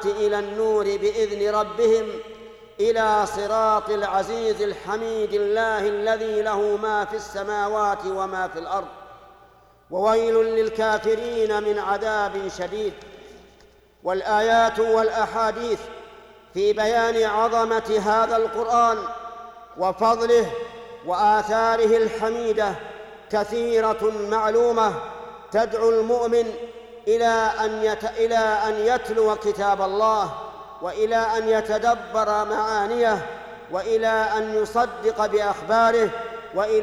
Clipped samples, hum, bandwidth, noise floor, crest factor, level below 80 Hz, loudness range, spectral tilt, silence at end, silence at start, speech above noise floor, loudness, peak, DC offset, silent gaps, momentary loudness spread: under 0.1%; none; 12.5 kHz; -53 dBFS; 14 dB; -52 dBFS; 3 LU; -4 dB/octave; 0 s; 0 s; 32 dB; -22 LUFS; -8 dBFS; under 0.1%; none; 12 LU